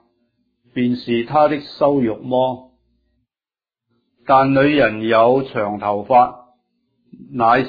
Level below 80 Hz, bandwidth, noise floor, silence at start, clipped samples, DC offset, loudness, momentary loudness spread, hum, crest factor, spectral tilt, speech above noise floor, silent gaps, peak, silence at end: -54 dBFS; 5 kHz; under -90 dBFS; 0.75 s; under 0.1%; under 0.1%; -17 LUFS; 9 LU; none; 16 dB; -9 dB/octave; over 74 dB; none; -2 dBFS; 0 s